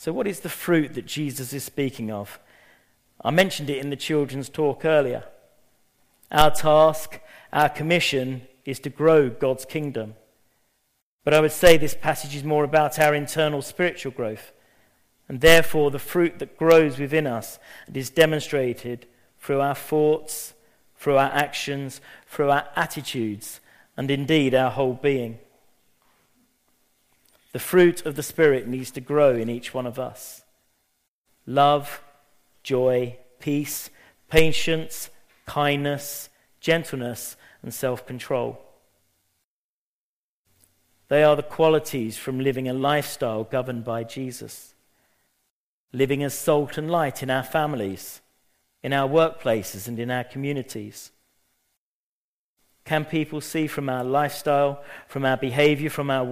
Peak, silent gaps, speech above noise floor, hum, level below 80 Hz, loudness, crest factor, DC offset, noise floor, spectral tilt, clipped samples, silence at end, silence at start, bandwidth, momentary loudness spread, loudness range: 0 dBFS; 11.02-11.19 s, 31.08-31.25 s, 39.44-40.45 s, 45.50-45.88 s, 51.77-52.56 s; over 68 dB; none; -48 dBFS; -23 LUFS; 24 dB; under 0.1%; under -90 dBFS; -5 dB/octave; under 0.1%; 0 s; 0 s; 15.5 kHz; 17 LU; 8 LU